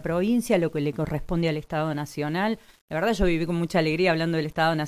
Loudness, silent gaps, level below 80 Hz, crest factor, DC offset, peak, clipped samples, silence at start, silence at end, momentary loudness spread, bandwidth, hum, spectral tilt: -25 LUFS; 2.81-2.88 s; -42 dBFS; 16 dB; under 0.1%; -8 dBFS; under 0.1%; 0 s; 0 s; 6 LU; 15.5 kHz; none; -6.5 dB/octave